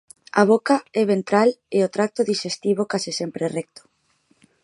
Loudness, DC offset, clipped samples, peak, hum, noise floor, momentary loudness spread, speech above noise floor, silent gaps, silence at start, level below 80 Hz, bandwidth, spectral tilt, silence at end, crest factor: -21 LUFS; under 0.1%; under 0.1%; 0 dBFS; none; -64 dBFS; 9 LU; 44 dB; none; 0.35 s; -72 dBFS; 11.5 kHz; -5 dB/octave; 1 s; 20 dB